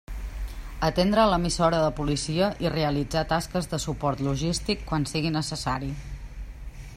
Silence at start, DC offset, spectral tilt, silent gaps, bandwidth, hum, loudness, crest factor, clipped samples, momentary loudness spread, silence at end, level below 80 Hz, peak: 0.1 s; under 0.1%; -5 dB/octave; none; 15.5 kHz; none; -26 LUFS; 20 dB; under 0.1%; 16 LU; 0 s; -38 dBFS; -8 dBFS